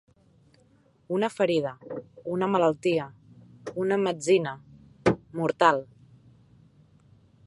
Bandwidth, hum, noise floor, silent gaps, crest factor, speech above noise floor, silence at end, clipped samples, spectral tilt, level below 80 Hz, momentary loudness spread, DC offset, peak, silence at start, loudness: 11.5 kHz; none; -62 dBFS; none; 22 dB; 37 dB; 1.65 s; under 0.1%; -5.5 dB/octave; -60 dBFS; 16 LU; under 0.1%; -6 dBFS; 1.1 s; -26 LUFS